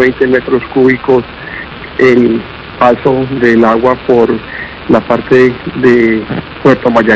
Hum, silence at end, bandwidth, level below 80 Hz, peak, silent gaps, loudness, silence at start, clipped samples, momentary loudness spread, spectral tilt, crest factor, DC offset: none; 0 s; 8 kHz; -36 dBFS; 0 dBFS; none; -10 LUFS; 0 s; 3%; 13 LU; -7.5 dB/octave; 10 dB; under 0.1%